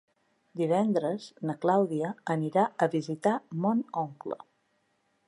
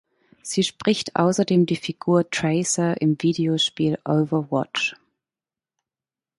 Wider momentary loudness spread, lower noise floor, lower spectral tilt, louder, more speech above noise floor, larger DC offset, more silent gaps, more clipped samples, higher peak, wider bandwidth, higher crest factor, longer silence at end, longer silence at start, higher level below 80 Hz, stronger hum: first, 10 LU vs 5 LU; second, -73 dBFS vs under -90 dBFS; first, -7.5 dB/octave vs -5 dB/octave; second, -29 LUFS vs -22 LUFS; second, 45 dB vs over 69 dB; neither; neither; neither; second, -12 dBFS vs -4 dBFS; about the same, 11 kHz vs 11.5 kHz; about the same, 18 dB vs 18 dB; second, 0.9 s vs 1.45 s; about the same, 0.55 s vs 0.45 s; second, -80 dBFS vs -64 dBFS; neither